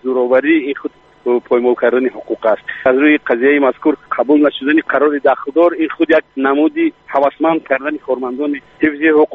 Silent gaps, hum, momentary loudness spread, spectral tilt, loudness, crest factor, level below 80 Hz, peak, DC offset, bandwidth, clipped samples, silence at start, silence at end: none; none; 8 LU; -7.5 dB/octave; -14 LUFS; 12 dB; -58 dBFS; -2 dBFS; under 0.1%; 4 kHz; under 0.1%; 0.05 s; 0 s